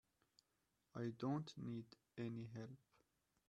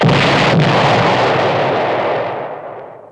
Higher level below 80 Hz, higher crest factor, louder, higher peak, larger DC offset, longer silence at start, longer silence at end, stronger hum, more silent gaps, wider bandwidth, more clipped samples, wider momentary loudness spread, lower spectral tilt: second, -84 dBFS vs -42 dBFS; about the same, 18 dB vs 14 dB; second, -50 LUFS vs -13 LUFS; second, -32 dBFS vs 0 dBFS; neither; first, 0.95 s vs 0 s; first, 0.75 s vs 0.05 s; neither; neither; about the same, 9.8 kHz vs 10.5 kHz; neither; second, 13 LU vs 16 LU; first, -7.5 dB/octave vs -6 dB/octave